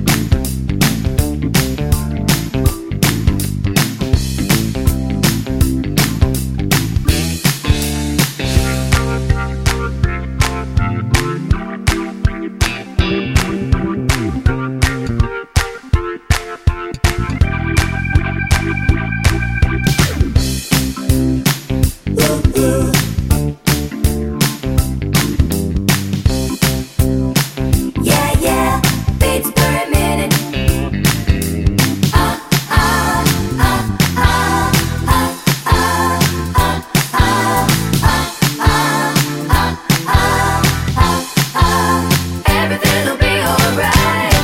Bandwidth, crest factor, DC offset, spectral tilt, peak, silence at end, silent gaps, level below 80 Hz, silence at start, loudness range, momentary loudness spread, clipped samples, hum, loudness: 16.5 kHz; 14 dB; under 0.1%; -4.5 dB/octave; 0 dBFS; 0 s; none; -22 dBFS; 0 s; 3 LU; 5 LU; under 0.1%; none; -15 LUFS